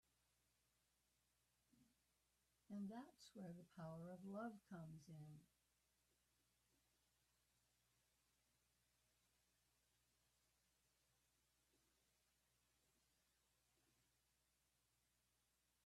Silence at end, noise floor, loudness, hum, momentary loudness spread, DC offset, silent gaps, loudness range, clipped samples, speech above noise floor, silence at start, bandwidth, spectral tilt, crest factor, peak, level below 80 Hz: 10.4 s; -87 dBFS; -58 LUFS; 60 Hz at -85 dBFS; 8 LU; under 0.1%; none; 6 LU; under 0.1%; 29 dB; 1.75 s; 13 kHz; -7 dB/octave; 22 dB; -42 dBFS; under -90 dBFS